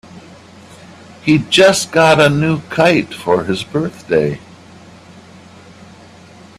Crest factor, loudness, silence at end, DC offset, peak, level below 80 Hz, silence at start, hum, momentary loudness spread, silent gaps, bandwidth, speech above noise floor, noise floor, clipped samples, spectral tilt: 16 dB; -13 LUFS; 2.2 s; under 0.1%; 0 dBFS; -50 dBFS; 0.15 s; none; 11 LU; none; 14 kHz; 27 dB; -40 dBFS; under 0.1%; -4.5 dB/octave